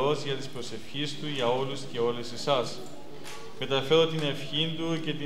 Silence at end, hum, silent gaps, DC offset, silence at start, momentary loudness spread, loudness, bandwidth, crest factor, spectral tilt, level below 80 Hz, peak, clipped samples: 0 s; none; none; 2%; 0 s; 18 LU; -29 LUFS; 15.5 kHz; 20 dB; -5 dB/octave; -68 dBFS; -10 dBFS; under 0.1%